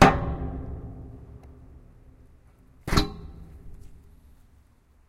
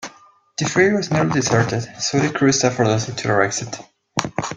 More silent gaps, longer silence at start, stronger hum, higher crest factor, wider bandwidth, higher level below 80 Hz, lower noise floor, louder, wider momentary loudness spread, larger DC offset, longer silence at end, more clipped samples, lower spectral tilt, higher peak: neither; about the same, 0 s vs 0 s; neither; first, 28 dB vs 20 dB; first, 16 kHz vs 10 kHz; first, -36 dBFS vs -54 dBFS; first, -58 dBFS vs -50 dBFS; second, -28 LUFS vs -19 LUFS; first, 24 LU vs 10 LU; neither; first, 1.15 s vs 0 s; neither; about the same, -5.5 dB/octave vs -4.5 dB/octave; about the same, -2 dBFS vs 0 dBFS